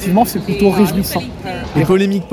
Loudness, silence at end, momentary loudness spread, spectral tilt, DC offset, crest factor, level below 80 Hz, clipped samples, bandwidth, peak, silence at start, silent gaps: -15 LUFS; 0 s; 10 LU; -6 dB/octave; under 0.1%; 14 dB; -36 dBFS; under 0.1%; 19.5 kHz; 0 dBFS; 0 s; none